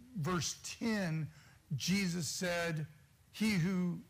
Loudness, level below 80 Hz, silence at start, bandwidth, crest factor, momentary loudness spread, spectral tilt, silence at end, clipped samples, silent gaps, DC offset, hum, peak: -36 LUFS; -64 dBFS; 0 s; 15.5 kHz; 14 dB; 10 LU; -4.5 dB/octave; 0.05 s; under 0.1%; none; under 0.1%; none; -24 dBFS